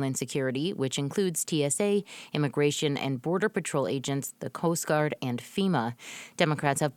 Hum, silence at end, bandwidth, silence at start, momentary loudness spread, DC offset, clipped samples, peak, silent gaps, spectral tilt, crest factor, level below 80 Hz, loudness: none; 0.05 s; 18.5 kHz; 0 s; 6 LU; under 0.1%; under 0.1%; -6 dBFS; none; -4.5 dB/octave; 22 dB; -72 dBFS; -29 LUFS